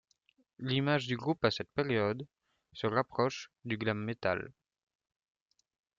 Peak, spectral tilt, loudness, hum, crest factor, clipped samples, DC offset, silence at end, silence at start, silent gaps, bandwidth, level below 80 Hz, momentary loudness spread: -14 dBFS; -6 dB/octave; -34 LUFS; none; 22 dB; under 0.1%; under 0.1%; 1.45 s; 0.6 s; none; 7.6 kHz; -70 dBFS; 12 LU